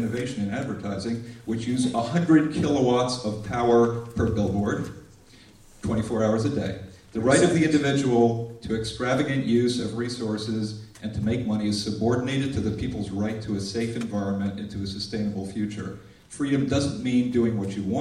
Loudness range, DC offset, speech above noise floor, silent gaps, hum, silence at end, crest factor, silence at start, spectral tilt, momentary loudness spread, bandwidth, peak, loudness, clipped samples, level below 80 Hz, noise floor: 6 LU; under 0.1%; 27 dB; none; none; 0 s; 18 dB; 0 s; -6 dB/octave; 11 LU; 12 kHz; -6 dBFS; -25 LUFS; under 0.1%; -50 dBFS; -51 dBFS